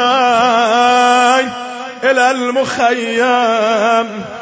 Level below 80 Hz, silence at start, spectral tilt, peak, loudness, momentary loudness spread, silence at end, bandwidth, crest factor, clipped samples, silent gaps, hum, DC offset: -58 dBFS; 0 s; -2.5 dB/octave; 0 dBFS; -12 LUFS; 8 LU; 0 s; 8 kHz; 12 dB; under 0.1%; none; none; under 0.1%